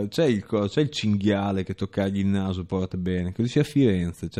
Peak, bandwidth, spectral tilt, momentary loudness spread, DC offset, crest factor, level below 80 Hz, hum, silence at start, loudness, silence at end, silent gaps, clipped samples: -8 dBFS; 14 kHz; -7 dB/octave; 6 LU; under 0.1%; 16 dB; -52 dBFS; none; 0 s; -25 LUFS; 0 s; none; under 0.1%